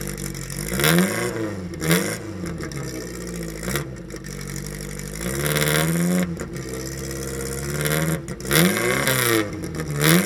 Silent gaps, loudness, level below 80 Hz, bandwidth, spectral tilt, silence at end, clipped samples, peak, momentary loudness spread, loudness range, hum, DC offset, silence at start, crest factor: none; -23 LUFS; -40 dBFS; 19.5 kHz; -4 dB/octave; 0 s; under 0.1%; 0 dBFS; 13 LU; 5 LU; none; under 0.1%; 0 s; 24 dB